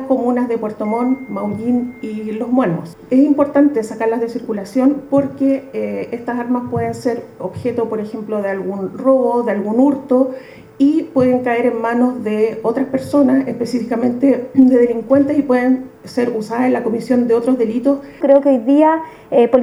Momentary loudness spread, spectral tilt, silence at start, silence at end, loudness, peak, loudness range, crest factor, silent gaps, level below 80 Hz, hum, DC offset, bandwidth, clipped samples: 10 LU; -7.5 dB/octave; 0 s; 0 s; -16 LUFS; 0 dBFS; 4 LU; 16 dB; none; -56 dBFS; none; under 0.1%; 12 kHz; under 0.1%